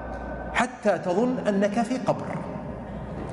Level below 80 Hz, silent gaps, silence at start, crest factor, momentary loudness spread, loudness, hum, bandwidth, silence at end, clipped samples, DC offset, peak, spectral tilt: -44 dBFS; none; 0 s; 16 dB; 11 LU; -27 LUFS; none; 11.5 kHz; 0 s; under 0.1%; under 0.1%; -10 dBFS; -6 dB/octave